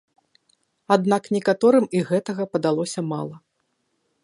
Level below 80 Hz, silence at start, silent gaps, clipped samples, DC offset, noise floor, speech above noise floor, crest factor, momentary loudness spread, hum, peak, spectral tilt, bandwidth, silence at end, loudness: -70 dBFS; 0.9 s; none; under 0.1%; under 0.1%; -72 dBFS; 52 dB; 22 dB; 10 LU; none; -2 dBFS; -6 dB/octave; 11.5 kHz; 0.85 s; -22 LUFS